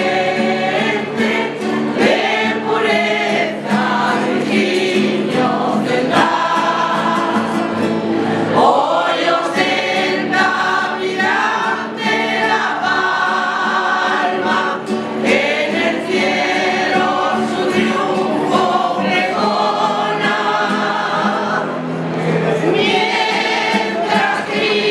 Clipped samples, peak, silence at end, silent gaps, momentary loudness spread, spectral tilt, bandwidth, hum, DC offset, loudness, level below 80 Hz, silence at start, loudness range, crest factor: under 0.1%; 0 dBFS; 0 s; none; 4 LU; -4.5 dB/octave; 12.5 kHz; none; under 0.1%; -16 LUFS; -64 dBFS; 0 s; 1 LU; 16 dB